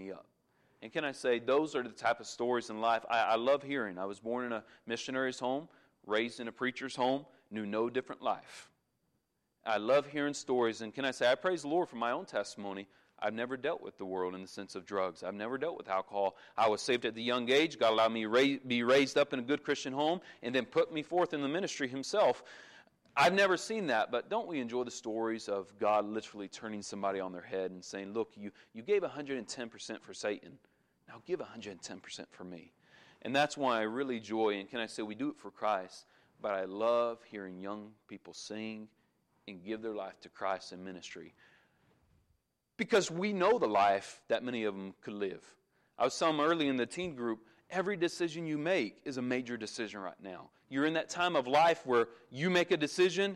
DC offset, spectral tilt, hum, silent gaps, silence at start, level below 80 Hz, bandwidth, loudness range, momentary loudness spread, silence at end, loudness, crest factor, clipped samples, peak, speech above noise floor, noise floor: under 0.1%; -4 dB/octave; none; none; 0 s; -80 dBFS; 13.5 kHz; 8 LU; 16 LU; 0 s; -34 LUFS; 18 dB; under 0.1%; -18 dBFS; 47 dB; -81 dBFS